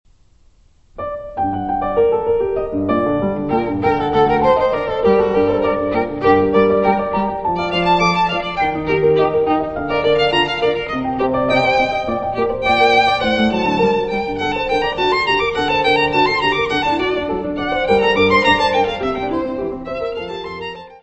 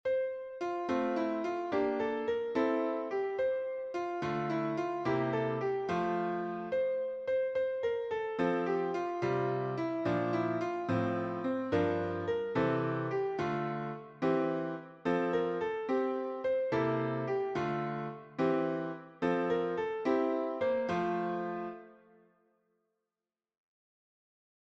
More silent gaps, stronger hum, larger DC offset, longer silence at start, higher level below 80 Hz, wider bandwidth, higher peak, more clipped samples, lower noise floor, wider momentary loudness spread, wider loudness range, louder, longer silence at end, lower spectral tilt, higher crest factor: neither; neither; first, 0.1% vs under 0.1%; first, 0.95 s vs 0.05 s; first, -40 dBFS vs -70 dBFS; about the same, 8.2 kHz vs 7.8 kHz; first, 0 dBFS vs -18 dBFS; neither; second, -52 dBFS vs under -90 dBFS; about the same, 8 LU vs 6 LU; about the same, 2 LU vs 1 LU; first, -16 LUFS vs -34 LUFS; second, 0.05 s vs 2.75 s; second, -6 dB/octave vs -7.5 dB/octave; about the same, 16 dB vs 16 dB